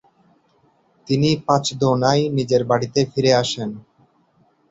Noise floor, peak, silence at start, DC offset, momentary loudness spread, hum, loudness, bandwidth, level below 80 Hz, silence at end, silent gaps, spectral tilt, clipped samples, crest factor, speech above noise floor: -60 dBFS; -2 dBFS; 1.05 s; under 0.1%; 8 LU; none; -19 LUFS; 8 kHz; -54 dBFS; 0.9 s; none; -5.5 dB/octave; under 0.1%; 18 dB; 42 dB